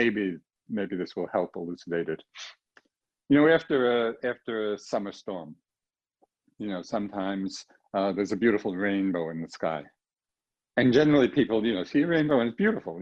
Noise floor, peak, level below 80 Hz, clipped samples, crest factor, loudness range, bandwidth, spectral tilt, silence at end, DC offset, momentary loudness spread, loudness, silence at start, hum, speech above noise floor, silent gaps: under -90 dBFS; -8 dBFS; -64 dBFS; under 0.1%; 18 dB; 9 LU; 8 kHz; -6.5 dB/octave; 0 s; under 0.1%; 16 LU; -27 LUFS; 0 s; none; over 64 dB; none